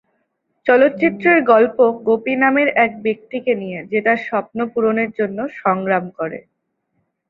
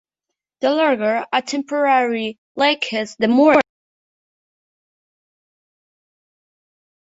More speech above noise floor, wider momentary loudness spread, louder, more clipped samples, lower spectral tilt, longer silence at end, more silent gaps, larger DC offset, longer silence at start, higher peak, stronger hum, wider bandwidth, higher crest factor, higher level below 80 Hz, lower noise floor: second, 53 dB vs 66 dB; about the same, 10 LU vs 9 LU; about the same, -17 LUFS vs -18 LUFS; neither; first, -8.5 dB/octave vs -4 dB/octave; second, 0.9 s vs 3.4 s; second, none vs 2.38-2.55 s; neither; about the same, 0.65 s vs 0.6 s; about the same, -2 dBFS vs 0 dBFS; neither; second, 5.2 kHz vs 8 kHz; about the same, 16 dB vs 20 dB; about the same, -62 dBFS vs -66 dBFS; second, -70 dBFS vs -83 dBFS